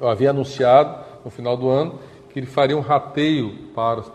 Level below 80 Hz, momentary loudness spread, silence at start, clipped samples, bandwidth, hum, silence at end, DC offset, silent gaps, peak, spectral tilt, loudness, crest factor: -58 dBFS; 18 LU; 0 s; under 0.1%; 10 kHz; none; 0 s; under 0.1%; none; -2 dBFS; -7 dB/octave; -19 LUFS; 18 dB